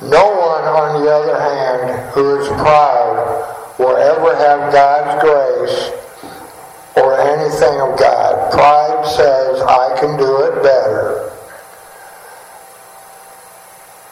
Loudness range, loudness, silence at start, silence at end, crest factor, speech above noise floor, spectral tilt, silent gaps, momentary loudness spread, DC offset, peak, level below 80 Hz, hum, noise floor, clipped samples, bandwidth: 5 LU; -12 LUFS; 0 s; 0.8 s; 14 dB; 27 dB; -5 dB/octave; none; 10 LU; under 0.1%; 0 dBFS; -48 dBFS; none; -38 dBFS; under 0.1%; 15.5 kHz